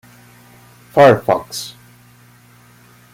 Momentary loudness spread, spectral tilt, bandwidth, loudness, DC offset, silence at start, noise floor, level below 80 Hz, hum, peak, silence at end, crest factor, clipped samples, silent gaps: 17 LU; -5.5 dB/octave; 16.5 kHz; -14 LUFS; under 0.1%; 0.95 s; -47 dBFS; -56 dBFS; 60 Hz at -45 dBFS; 0 dBFS; 1.45 s; 18 dB; under 0.1%; none